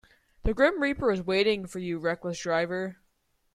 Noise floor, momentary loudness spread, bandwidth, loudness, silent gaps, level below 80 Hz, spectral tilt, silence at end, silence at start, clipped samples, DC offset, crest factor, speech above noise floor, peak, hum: -71 dBFS; 10 LU; 13.5 kHz; -28 LUFS; none; -42 dBFS; -5 dB/octave; 0.6 s; 0.45 s; under 0.1%; under 0.1%; 18 dB; 44 dB; -10 dBFS; none